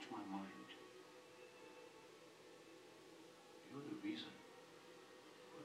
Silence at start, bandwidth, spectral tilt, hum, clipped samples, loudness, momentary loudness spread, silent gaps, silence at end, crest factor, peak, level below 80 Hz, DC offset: 0 s; 15.5 kHz; -4.5 dB/octave; none; under 0.1%; -56 LUFS; 12 LU; none; 0 s; 20 dB; -34 dBFS; under -90 dBFS; under 0.1%